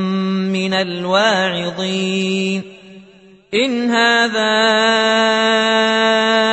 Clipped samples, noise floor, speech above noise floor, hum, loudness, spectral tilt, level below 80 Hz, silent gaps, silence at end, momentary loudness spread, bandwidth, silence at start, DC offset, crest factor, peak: under 0.1%; -45 dBFS; 30 dB; none; -15 LUFS; -4 dB/octave; -62 dBFS; none; 0 s; 7 LU; 8.4 kHz; 0 s; under 0.1%; 14 dB; -2 dBFS